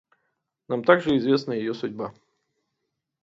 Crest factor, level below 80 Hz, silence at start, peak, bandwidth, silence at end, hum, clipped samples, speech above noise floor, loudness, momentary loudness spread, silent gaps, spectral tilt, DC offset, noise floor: 24 dB; -64 dBFS; 0.7 s; -2 dBFS; 7.6 kHz; 1.1 s; none; under 0.1%; 58 dB; -23 LUFS; 14 LU; none; -7 dB/octave; under 0.1%; -80 dBFS